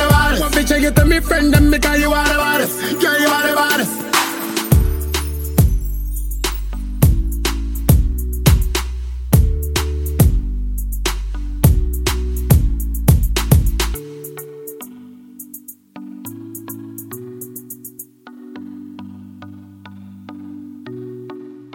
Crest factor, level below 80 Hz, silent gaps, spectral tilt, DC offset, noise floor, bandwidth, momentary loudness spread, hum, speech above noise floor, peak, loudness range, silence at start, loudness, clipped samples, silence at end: 18 dB; -22 dBFS; none; -5 dB/octave; under 0.1%; -38 dBFS; 17 kHz; 21 LU; none; 24 dB; 0 dBFS; 19 LU; 0 s; -17 LUFS; under 0.1%; 0.05 s